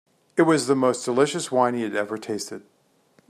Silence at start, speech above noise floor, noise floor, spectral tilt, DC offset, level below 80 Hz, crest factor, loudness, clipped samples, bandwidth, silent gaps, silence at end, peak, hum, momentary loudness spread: 0.35 s; 39 dB; -61 dBFS; -4.5 dB/octave; under 0.1%; -72 dBFS; 18 dB; -23 LUFS; under 0.1%; 14.5 kHz; none; 0.7 s; -4 dBFS; none; 11 LU